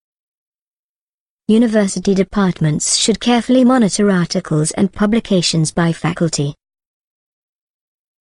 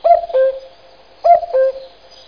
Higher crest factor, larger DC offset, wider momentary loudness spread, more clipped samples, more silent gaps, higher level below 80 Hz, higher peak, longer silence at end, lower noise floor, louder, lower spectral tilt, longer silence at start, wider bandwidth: about the same, 16 dB vs 14 dB; second, under 0.1% vs 0.3%; second, 5 LU vs 14 LU; neither; neither; first, -44 dBFS vs -52 dBFS; about the same, -2 dBFS vs 0 dBFS; first, 1.7 s vs 0.4 s; first, under -90 dBFS vs -45 dBFS; about the same, -15 LUFS vs -15 LUFS; about the same, -5 dB/octave vs -4 dB/octave; first, 1.5 s vs 0.05 s; first, 11.5 kHz vs 5.2 kHz